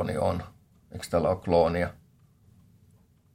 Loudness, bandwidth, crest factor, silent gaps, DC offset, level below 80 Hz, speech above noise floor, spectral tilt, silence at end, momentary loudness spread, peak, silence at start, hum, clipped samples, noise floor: -27 LUFS; 15.5 kHz; 20 dB; none; under 0.1%; -56 dBFS; 34 dB; -6.5 dB/octave; 1.4 s; 19 LU; -10 dBFS; 0 s; none; under 0.1%; -61 dBFS